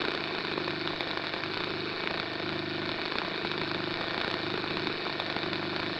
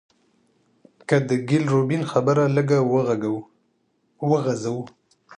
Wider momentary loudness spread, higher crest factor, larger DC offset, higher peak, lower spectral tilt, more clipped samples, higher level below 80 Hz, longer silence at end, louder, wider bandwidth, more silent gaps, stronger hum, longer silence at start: second, 1 LU vs 11 LU; about the same, 20 dB vs 18 dB; neither; second, -12 dBFS vs -4 dBFS; second, -5.5 dB/octave vs -7.5 dB/octave; neither; first, -60 dBFS vs -68 dBFS; about the same, 0 s vs 0.05 s; second, -32 LUFS vs -22 LUFS; about the same, 9.8 kHz vs 10 kHz; neither; first, 50 Hz at -50 dBFS vs none; second, 0 s vs 1.1 s